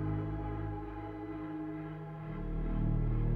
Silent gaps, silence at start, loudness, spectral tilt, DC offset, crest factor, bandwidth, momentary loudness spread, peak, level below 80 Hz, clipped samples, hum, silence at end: none; 0 s; -39 LUFS; -11 dB/octave; under 0.1%; 14 dB; 4.1 kHz; 9 LU; -22 dBFS; -40 dBFS; under 0.1%; none; 0 s